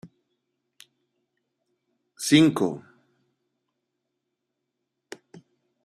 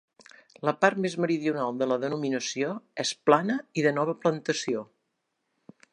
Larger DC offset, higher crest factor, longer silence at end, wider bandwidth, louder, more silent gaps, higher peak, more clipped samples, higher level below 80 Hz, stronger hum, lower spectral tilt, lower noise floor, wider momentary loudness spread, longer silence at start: neither; about the same, 26 dB vs 24 dB; first, 3.05 s vs 1.1 s; first, 13.5 kHz vs 11 kHz; first, -21 LUFS vs -27 LUFS; neither; about the same, -4 dBFS vs -4 dBFS; neither; first, -70 dBFS vs -80 dBFS; neither; about the same, -4.5 dB/octave vs -4.5 dB/octave; about the same, -82 dBFS vs -79 dBFS; first, 27 LU vs 8 LU; second, 0.05 s vs 0.65 s